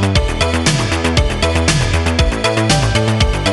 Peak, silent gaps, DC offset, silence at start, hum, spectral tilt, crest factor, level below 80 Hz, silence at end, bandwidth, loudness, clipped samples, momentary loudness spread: 0 dBFS; none; under 0.1%; 0 s; none; -4.5 dB/octave; 14 dB; -20 dBFS; 0 s; 12 kHz; -14 LUFS; under 0.1%; 2 LU